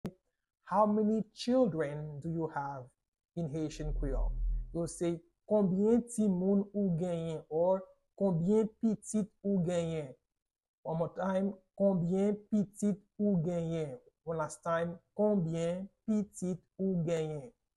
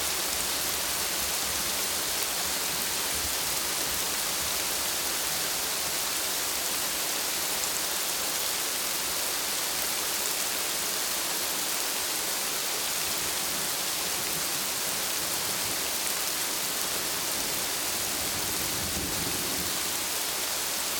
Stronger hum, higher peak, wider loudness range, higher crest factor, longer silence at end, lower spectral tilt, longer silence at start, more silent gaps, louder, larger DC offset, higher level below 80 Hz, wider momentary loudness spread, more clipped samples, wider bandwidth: neither; second, -16 dBFS vs -8 dBFS; first, 4 LU vs 1 LU; about the same, 18 dB vs 22 dB; first, 0.3 s vs 0 s; first, -7.5 dB/octave vs 0 dB/octave; about the same, 0.05 s vs 0 s; first, 3.08-3.12 s, 10.68-10.83 s vs none; second, -34 LUFS vs -27 LUFS; neither; first, -46 dBFS vs -54 dBFS; first, 10 LU vs 1 LU; neither; second, 12 kHz vs 17.5 kHz